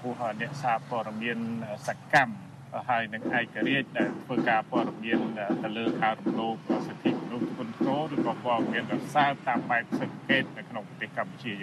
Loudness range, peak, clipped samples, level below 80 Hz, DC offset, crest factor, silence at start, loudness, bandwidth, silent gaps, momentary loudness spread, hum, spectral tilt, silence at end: 2 LU; -6 dBFS; under 0.1%; -72 dBFS; under 0.1%; 22 dB; 0 s; -29 LUFS; 13 kHz; none; 9 LU; none; -6 dB/octave; 0 s